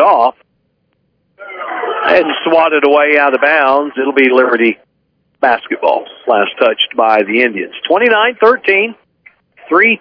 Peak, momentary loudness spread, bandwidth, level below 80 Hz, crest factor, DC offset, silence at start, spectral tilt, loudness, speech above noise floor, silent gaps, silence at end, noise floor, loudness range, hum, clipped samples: 0 dBFS; 9 LU; 5.4 kHz; -60 dBFS; 12 dB; under 0.1%; 0 s; -6 dB/octave; -11 LUFS; 51 dB; none; 0.05 s; -62 dBFS; 3 LU; none; 0.3%